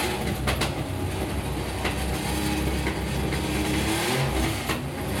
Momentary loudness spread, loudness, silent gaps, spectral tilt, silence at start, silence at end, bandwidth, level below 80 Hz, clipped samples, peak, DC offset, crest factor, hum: 5 LU; -27 LUFS; none; -4.5 dB/octave; 0 s; 0 s; 17 kHz; -34 dBFS; under 0.1%; -12 dBFS; under 0.1%; 16 dB; none